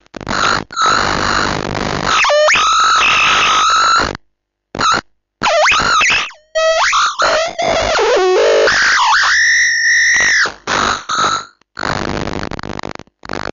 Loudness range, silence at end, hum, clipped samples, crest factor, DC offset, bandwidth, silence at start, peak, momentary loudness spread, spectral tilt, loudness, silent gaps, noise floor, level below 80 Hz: 3 LU; 0.15 s; none; under 0.1%; 12 dB; under 0.1%; 7.8 kHz; 0.2 s; -2 dBFS; 13 LU; -1.5 dB/octave; -12 LUFS; none; -65 dBFS; -38 dBFS